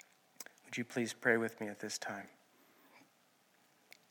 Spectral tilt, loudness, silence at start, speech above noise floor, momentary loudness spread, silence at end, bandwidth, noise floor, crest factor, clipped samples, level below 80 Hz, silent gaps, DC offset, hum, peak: -3.5 dB/octave; -38 LUFS; 0.4 s; 34 dB; 20 LU; 1.1 s; 17.5 kHz; -71 dBFS; 28 dB; under 0.1%; under -90 dBFS; none; under 0.1%; none; -14 dBFS